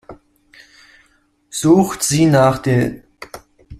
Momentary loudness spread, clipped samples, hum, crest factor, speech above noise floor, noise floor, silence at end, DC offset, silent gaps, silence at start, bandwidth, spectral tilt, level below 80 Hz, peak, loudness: 23 LU; under 0.1%; none; 16 dB; 45 dB; -58 dBFS; 0.05 s; under 0.1%; none; 0.1 s; 15 kHz; -5.5 dB/octave; -48 dBFS; -2 dBFS; -15 LUFS